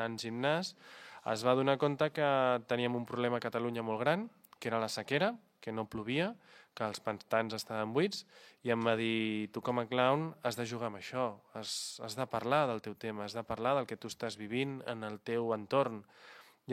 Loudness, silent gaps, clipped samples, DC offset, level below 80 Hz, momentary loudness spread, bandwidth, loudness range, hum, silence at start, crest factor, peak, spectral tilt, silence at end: -35 LUFS; none; under 0.1%; under 0.1%; -74 dBFS; 11 LU; 16 kHz; 4 LU; none; 0 s; 22 dB; -14 dBFS; -5 dB/octave; 0 s